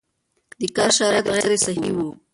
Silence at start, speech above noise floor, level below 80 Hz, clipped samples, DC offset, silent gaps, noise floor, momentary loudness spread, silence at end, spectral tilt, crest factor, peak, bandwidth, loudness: 0.6 s; 44 dB; -56 dBFS; under 0.1%; under 0.1%; none; -64 dBFS; 9 LU; 0.2 s; -2.5 dB/octave; 16 dB; -4 dBFS; 11.5 kHz; -20 LUFS